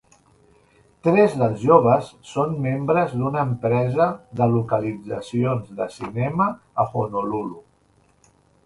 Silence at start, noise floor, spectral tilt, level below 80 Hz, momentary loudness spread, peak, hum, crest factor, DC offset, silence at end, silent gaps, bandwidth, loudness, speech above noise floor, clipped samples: 1.05 s; -60 dBFS; -8.5 dB/octave; -54 dBFS; 12 LU; -2 dBFS; none; 20 dB; under 0.1%; 1.05 s; none; 11.5 kHz; -21 LUFS; 39 dB; under 0.1%